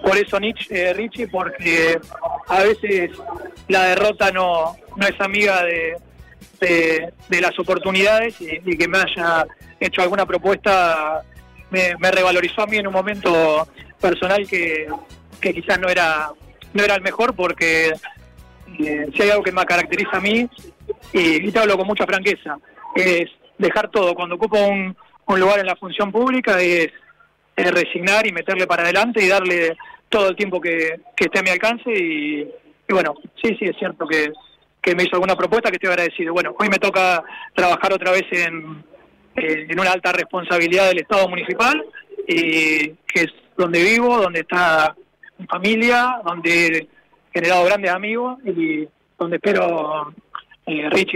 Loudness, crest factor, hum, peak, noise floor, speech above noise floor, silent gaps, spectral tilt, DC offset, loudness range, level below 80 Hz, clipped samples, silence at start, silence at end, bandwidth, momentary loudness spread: -18 LUFS; 12 dB; none; -6 dBFS; -54 dBFS; 36 dB; none; -4 dB/octave; under 0.1%; 3 LU; -52 dBFS; under 0.1%; 0 s; 0 s; 16 kHz; 11 LU